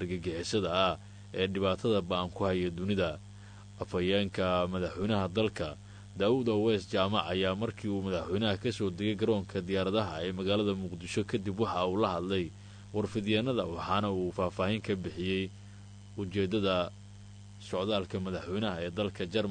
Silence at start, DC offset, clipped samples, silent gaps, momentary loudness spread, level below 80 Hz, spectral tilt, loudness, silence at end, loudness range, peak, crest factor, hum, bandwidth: 0 s; under 0.1%; under 0.1%; none; 12 LU; -58 dBFS; -6 dB/octave; -32 LUFS; 0 s; 3 LU; -14 dBFS; 20 dB; 50 Hz at -50 dBFS; 9.6 kHz